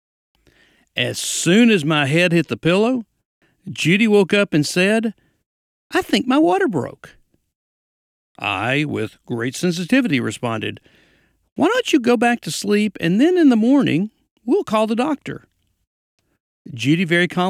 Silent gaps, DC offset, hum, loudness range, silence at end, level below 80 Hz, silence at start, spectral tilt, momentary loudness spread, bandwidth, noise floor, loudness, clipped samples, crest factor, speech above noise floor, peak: 3.25-3.41 s, 5.46-5.90 s, 7.55-8.35 s, 11.52-11.56 s, 14.31-14.36 s, 15.87-16.18 s, 16.40-16.65 s; under 0.1%; none; 5 LU; 0 s; -60 dBFS; 0.95 s; -5 dB/octave; 13 LU; 15.5 kHz; -59 dBFS; -18 LUFS; under 0.1%; 16 dB; 42 dB; -4 dBFS